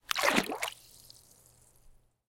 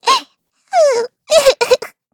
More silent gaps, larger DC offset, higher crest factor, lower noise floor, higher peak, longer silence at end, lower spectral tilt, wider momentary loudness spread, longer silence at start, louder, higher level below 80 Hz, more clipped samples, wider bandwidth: neither; neither; first, 32 dB vs 14 dB; first, -62 dBFS vs -50 dBFS; second, -4 dBFS vs 0 dBFS; first, 1.55 s vs 0.25 s; first, -2 dB/octave vs 0 dB/octave; first, 26 LU vs 6 LU; about the same, 0.1 s vs 0.05 s; second, -30 LUFS vs -14 LUFS; second, -64 dBFS vs -50 dBFS; neither; second, 17 kHz vs 19 kHz